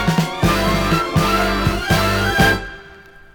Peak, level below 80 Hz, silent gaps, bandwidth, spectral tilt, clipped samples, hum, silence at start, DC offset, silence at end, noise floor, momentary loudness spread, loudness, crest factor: -2 dBFS; -28 dBFS; none; over 20 kHz; -5 dB/octave; under 0.1%; none; 0 s; under 0.1%; 0.35 s; -42 dBFS; 4 LU; -17 LUFS; 16 dB